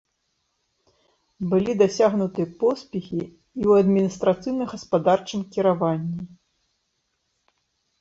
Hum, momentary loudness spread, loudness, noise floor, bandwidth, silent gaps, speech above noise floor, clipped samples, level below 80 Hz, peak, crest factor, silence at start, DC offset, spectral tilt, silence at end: none; 13 LU; -23 LUFS; -74 dBFS; 7.8 kHz; none; 52 dB; under 0.1%; -60 dBFS; -6 dBFS; 18 dB; 1.4 s; under 0.1%; -7 dB/octave; 1.75 s